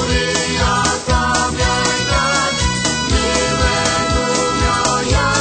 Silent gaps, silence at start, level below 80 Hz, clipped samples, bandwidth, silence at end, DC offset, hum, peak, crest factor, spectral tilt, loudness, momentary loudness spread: none; 0 s; -24 dBFS; under 0.1%; 9.4 kHz; 0 s; under 0.1%; none; -2 dBFS; 14 dB; -3 dB/octave; -15 LUFS; 1 LU